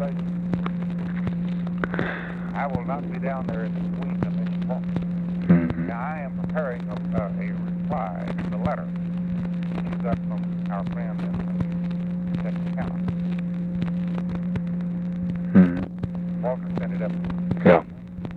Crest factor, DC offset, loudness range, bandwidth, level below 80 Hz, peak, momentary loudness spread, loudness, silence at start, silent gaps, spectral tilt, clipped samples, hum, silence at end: 22 dB; under 0.1%; 3 LU; 4.4 kHz; -46 dBFS; -2 dBFS; 8 LU; -26 LUFS; 0 s; none; -10 dB/octave; under 0.1%; none; 0 s